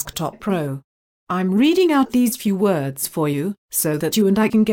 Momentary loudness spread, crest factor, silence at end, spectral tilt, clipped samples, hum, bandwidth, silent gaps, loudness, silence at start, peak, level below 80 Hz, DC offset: 9 LU; 12 dB; 0 s; -5 dB/octave; under 0.1%; none; 17 kHz; 0.84-1.27 s, 3.58-3.69 s; -19 LUFS; 0 s; -6 dBFS; -54 dBFS; under 0.1%